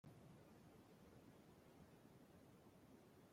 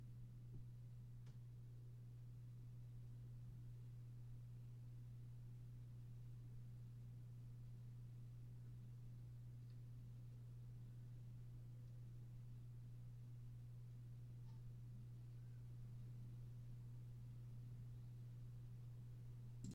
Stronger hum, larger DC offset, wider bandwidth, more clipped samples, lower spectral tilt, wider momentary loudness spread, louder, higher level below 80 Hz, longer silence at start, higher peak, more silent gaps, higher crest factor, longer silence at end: neither; neither; first, 16 kHz vs 10.5 kHz; neither; second, -6 dB/octave vs -8 dB/octave; about the same, 2 LU vs 2 LU; second, -67 LUFS vs -58 LUFS; second, -84 dBFS vs -66 dBFS; about the same, 0.05 s vs 0 s; second, -52 dBFS vs -40 dBFS; neither; about the same, 14 dB vs 16 dB; about the same, 0 s vs 0 s